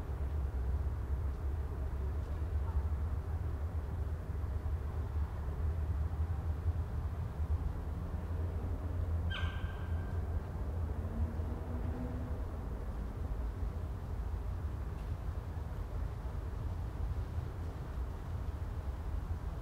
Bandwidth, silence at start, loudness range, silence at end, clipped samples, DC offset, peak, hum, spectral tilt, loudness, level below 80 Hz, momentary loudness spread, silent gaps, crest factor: 7.6 kHz; 0 s; 3 LU; 0 s; under 0.1%; under 0.1%; -24 dBFS; none; -8 dB/octave; -40 LUFS; -40 dBFS; 5 LU; none; 12 dB